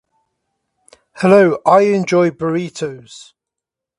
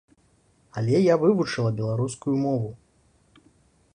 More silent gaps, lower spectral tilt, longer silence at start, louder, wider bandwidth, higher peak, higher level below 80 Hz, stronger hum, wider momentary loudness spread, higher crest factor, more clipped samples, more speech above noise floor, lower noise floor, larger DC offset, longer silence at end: neither; about the same, -6.5 dB/octave vs -7 dB/octave; first, 1.15 s vs 0.75 s; first, -14 LUFS vs -24 LUFS; about the same, 11.5 kHz vs 10.5 kHz; first, 0 dBFS vs -8 dBFS; about the same, -60 dBFS vs -60 dBFS; neither; first, 15 LU vs 11 LU; about the same, 16 dB vs 18 dB; neither; first, 70 dB vs 40 dB; first, -84 dBFS vs -63 dBFS; neither; second, 0.8 s vs 1.2 s